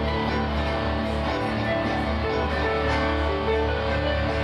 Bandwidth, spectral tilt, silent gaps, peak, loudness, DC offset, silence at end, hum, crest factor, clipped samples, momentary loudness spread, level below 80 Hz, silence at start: 10 kHz; -7 dB/octave; none; -12 dBFS; -25 LUFS; under 0.1%; 0 s; none; 12 dB; under 0.1%; 2 LU; -32 dBFS; 0 s